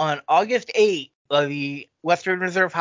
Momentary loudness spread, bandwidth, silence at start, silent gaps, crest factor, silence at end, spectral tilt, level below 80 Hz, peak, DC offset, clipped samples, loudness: 9 LU; 7.6 kHz; 0 s; 1.15-1.25 s; 18 dB; 0 s; -4.5 dB/octave; -74 dBFS; -4 dBFS; under 0.1%; under 0.1%; -22 LUFS